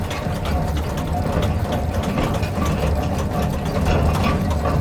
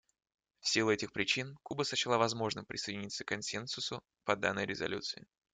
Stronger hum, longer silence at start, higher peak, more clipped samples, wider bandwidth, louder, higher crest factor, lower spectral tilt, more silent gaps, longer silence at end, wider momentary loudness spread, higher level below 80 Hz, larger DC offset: neither; second, 0 s vs 0.65 s; first, -6 dBFS vs -14 dBFS; neither; first, 18.5 kHz vs 9.6 kHz; first, -21 LUFS vs -35 LUFS; second, 14 dB vs 22 dB; first, -6.5 dB/octave vs -3 dB/octave; neither; second, 0 s vs 0.35 s; second, 4 LU vs 9 LU; first, -26 dBFS vs -72 dBFS; neither